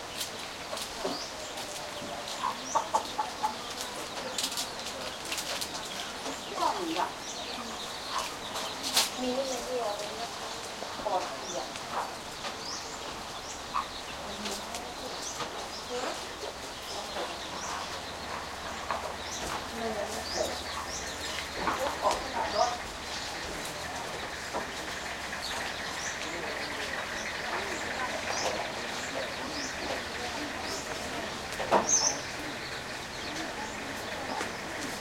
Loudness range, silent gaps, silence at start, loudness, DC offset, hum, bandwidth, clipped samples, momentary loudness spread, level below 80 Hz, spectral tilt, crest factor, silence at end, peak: 6 LU; none; 0 s; -33 LUFS; under 0.1%; none; 16.5 kHz; under 0.1%; 7 LU; -56 dBFS; -1.5 dB/octave; 26 dB; 0 s; -10 dBFS